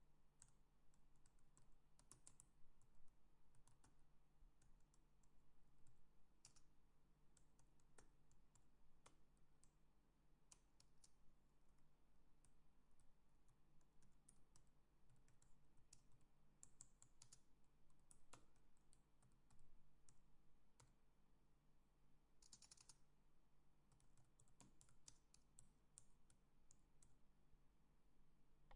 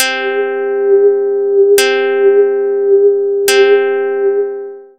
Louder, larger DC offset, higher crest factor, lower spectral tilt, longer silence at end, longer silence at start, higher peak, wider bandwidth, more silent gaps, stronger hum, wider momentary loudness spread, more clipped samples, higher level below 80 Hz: second, -69 LUFS vs -11 LUFS; second, under 0.1% vs 0.3%; first, 26 dB vs 12 dB; first, -3 dB/octave vs -0.5 dB/octave; second, 0 s vs 0.15 s; about the same, 0 s vs 0 s; second, -40 dBFS vs 0 dBFS; second, 10.5 kHz vs 15.5 kHz; neither; neither; second, 3 LU vs 7 LU; neither; second, -78 dBFS vs -64 dBFS